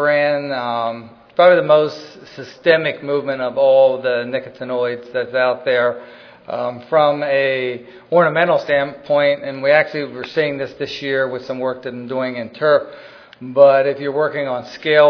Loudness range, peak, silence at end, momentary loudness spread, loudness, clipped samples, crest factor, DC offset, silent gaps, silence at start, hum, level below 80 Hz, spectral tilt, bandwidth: 4 LU; 0 dBFS; 0 s; 13 LU; -17 LUFS; under 0.1%; 16 dB; under 0.1%; none; 0 s; none; -64 dBFS; -6.5 dB/octave; 5.4 kHz